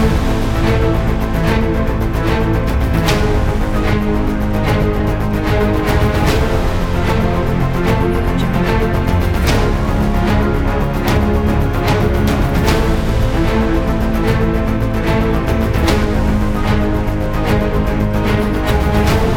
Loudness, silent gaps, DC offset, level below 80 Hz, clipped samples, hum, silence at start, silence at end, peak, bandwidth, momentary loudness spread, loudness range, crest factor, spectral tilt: -16 LUFS; none; under 0.1%; -18 dBFS; under 0.1%; none; 0 s; 0 s; 0 dBFS; 17.5 kHz; 3 LU; 1 LU; 14 dB; -7 dB/octave